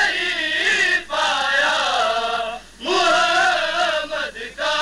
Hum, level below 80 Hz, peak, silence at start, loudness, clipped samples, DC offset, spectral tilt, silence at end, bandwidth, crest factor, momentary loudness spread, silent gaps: none; -52 dBFS; -6 dBFS; 0 s; -18 LUFS; under 0.1%; under 0.1%; -0.5 dB/octave; 0 s; 13.5 kHz; 14 dB; 10 LU; none